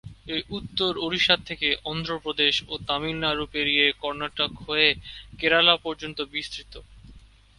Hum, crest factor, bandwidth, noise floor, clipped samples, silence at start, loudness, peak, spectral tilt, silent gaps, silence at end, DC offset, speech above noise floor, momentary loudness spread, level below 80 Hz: none; 24 dB; 11.5 kHz; -50 dBFS; under 0.1%; 0.05 s; -24 LUFS; -4 dBFS; -4 dB/octave; none; 0.35 s; under 0.1%; 24 dB; 12 LU; -50 dBFS